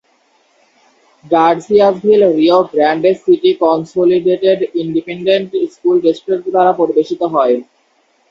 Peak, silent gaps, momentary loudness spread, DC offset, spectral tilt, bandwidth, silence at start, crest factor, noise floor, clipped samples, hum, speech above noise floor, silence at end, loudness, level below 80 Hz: 0 dBFS; none; 6 LU; under 0.1%; -7 dB/octave; 7.6 kHz; 1.25 s; 14 dB; -57 dBFS; under 0.1%; none; 45 dB; 0.65 s; -13 LUFS; -60 dBFS